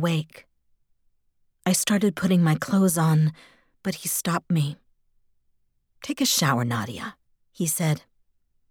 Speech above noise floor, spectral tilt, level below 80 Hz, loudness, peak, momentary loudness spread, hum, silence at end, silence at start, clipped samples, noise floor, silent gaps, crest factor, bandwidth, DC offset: 44 dB; -4.5 dB/octave; -64 dBFS; -24 LUFS; -8 dBFS; 13 LU; none; 0.7 s; 0 s; under 0.1%; -68 dBFS; none; 18 dB; 19 kHz; under 0.1%